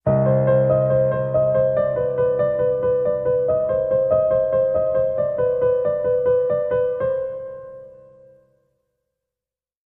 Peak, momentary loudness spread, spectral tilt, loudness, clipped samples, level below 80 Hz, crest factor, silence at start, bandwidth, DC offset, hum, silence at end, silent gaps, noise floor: -6 dBFS; 5 LU; -11.5 dB/octave; -19 LUFS; under 0.1%; -48 dBFS; 14 dB; 0.05 s; 3.4 kHz; under 0.1%; none; 1.95 s; none; -90 dBFS